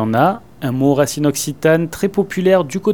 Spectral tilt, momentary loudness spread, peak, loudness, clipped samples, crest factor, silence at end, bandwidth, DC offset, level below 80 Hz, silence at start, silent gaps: -5.5 dB/octave; 4 LU; 0 dBFS; -16 LUFS; under 0.1%; 16 dB; 0 s; 19 kHz; 0.6%; -50 dBFS; 0 s; none